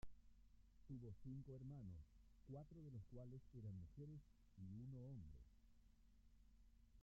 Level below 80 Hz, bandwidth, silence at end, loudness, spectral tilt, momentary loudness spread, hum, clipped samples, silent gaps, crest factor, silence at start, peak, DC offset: -70 dBFS; 15.5 kHz; 0 s; -59 LUFS; -9.5 dB/octave; 5 LU; none; under 0.1%; none; 16 dB; 0 s; -44 dBFS; under 0.1%